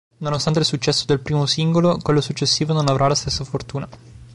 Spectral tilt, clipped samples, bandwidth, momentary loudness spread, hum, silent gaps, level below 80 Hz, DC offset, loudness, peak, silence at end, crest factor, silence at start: -5 dB/octave; under 0.1%; 11.5 kHz; 10 LU; none; none; -44 dBFS; 0.2%; -19 LUFS; -6 dBFS; 0 s; 14 dB; 0.2 s